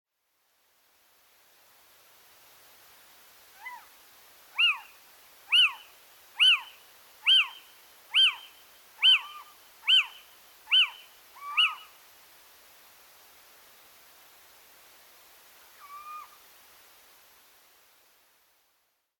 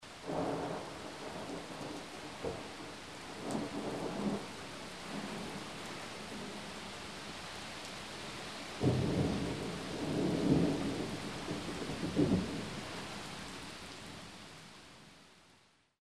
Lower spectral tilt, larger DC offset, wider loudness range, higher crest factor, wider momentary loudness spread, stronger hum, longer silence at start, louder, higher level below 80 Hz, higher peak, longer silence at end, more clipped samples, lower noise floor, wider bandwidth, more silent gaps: second, 4 dB/octave vs -5.5 dB/octave; neither; about the same, 9 LU vs 9 LU; about the same, 20 dB vs 22 dB; first, 26 LU vs 14 LU; neither; first, 3.65 s vs 0 s; first, -23 LUFS vs -39 LUFS; second, -84 dBFS vs -58 dBFS; first, -12 dBFS vs -16 dBFS; first, 2.95 s vs 0 s; neither; first, -74 dBFS vs -68 dBFS; first, 19 kHz vs 13.5 kHz; neither